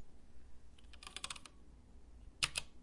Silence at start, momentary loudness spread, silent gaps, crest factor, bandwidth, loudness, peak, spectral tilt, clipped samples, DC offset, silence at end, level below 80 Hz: 0 s; 26 LU; none; 32 dB; 11.5 kHz; -42 LUFS; -16 dBFS; -0.5 dB/octave; under 0.1%; under 0.1%; 0 s; -60 dBFS